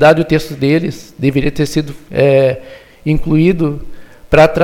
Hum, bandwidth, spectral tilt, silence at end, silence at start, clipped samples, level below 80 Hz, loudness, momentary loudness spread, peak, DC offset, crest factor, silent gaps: none; 16 kHz; -7 dB/octave; 0 s; 0 s; 0.2%; -32 dBFS; -14 LUFS; 11 LU; 0 dBFS; under 0.1%; 12 dB; none